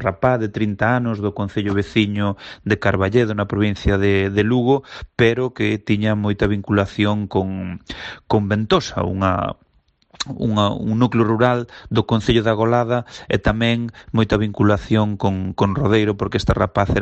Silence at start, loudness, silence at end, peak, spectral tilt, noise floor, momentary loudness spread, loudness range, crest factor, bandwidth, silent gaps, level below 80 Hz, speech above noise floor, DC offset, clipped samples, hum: 0 s; -19 LUFS; 0 s; -2 dBFS; -7 dB/octave; -59 dBFS; 7 LU; 2 LU; 16 dB; 8.2 kHz; none; -38 dBFS; 41 dB; under 0.1%; under 0.1%; none